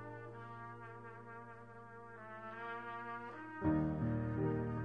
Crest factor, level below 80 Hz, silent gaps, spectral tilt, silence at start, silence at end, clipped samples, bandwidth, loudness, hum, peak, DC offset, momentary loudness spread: 18 dB; -62 dBFS; none; -10 dB/octave; 0 s; 0 s; under 0.1%; 5.2 kHz; -42 LUFS; none; -24 dBFS; under 0.1%; 17 LU